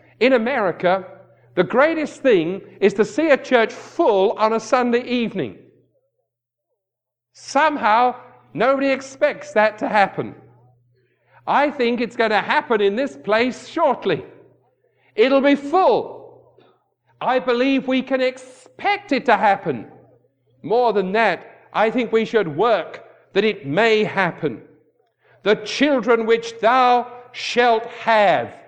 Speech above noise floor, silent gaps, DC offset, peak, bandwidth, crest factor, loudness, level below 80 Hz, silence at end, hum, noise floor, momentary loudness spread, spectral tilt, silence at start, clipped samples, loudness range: 65 dB; none; under 0.1%; 0 dBFS; 9.4 kHz; 18 dB; -19 LUFS; -66 dBFS; 0.1 s; none; -83 dBFS; 10 LU; -5 dB/octave; 0.2 s; under 0.1%; 3 LU